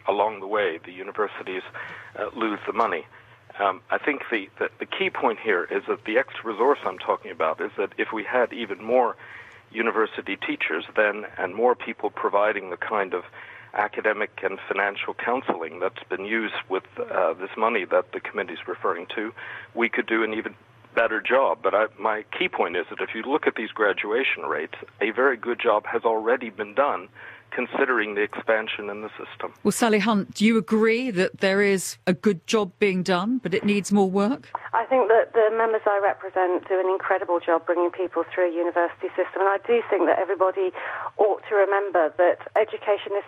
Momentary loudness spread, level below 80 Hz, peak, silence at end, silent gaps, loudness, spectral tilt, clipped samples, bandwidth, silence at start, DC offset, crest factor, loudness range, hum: 10 LU; -70 dBFS; -6 dBFS; 0 s; none; -24 LUFS; -5 dB/octave; under 0.1%; 14 kHz; 0.05 s; under 0.1%; 18 dB; 5 LU; none